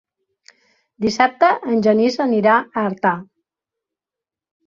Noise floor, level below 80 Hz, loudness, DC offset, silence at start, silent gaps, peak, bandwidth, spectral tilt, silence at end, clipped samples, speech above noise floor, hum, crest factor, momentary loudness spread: -88 dBFS; -62 dBFS; -17 LUFS; under 0.1%; 1 s; none; 0 dBFS; 7.4 kHz; -5.5 dB/octave; 1.45 s; under 0.1%; 71 dB; none; 20 dB; 8 LU